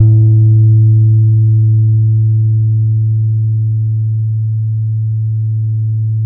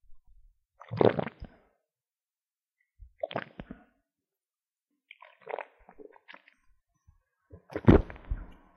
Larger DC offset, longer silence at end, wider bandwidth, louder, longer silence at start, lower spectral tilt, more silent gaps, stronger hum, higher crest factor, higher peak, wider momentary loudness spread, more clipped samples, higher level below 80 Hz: neither; second, 0 s vs 0.25 s; second, 0.7 kHz vs 6.4 kHz; first, -12 LUFS vs -29 LUFS; about the same, 0 s vs 0.1 s; first, -19 dB/octave vs -9.5 dB/octave; neither; neither; second, 10 dB vs 30 dB; first, 0 dBFS vs -4 dBFS; second, 7 LU vs 29 LU; neither; about the same, -42 dBFS vs -42 dBFS